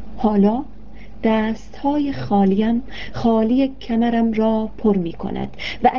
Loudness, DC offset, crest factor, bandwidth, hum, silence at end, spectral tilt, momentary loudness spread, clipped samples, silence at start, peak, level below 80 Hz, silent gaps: -20 LUFS; 3%; 18 dB; 6.8 kHz; none; 0 s; -8.5 dB/octave; 10 LU; under 0.1%; 0 s; 0 dBFS; -42 dBFS; none